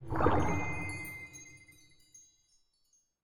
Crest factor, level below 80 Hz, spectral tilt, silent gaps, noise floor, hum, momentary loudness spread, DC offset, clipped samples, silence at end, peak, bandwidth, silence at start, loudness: 22 dB; -52 dBFS; -6.5 dB/octave; none; -73 dBFS; none; 22 LU; under 0.1%; under 0.1%; 0 s; -12 dBFS; 17.5 kHz; 0 s; -34 LUFS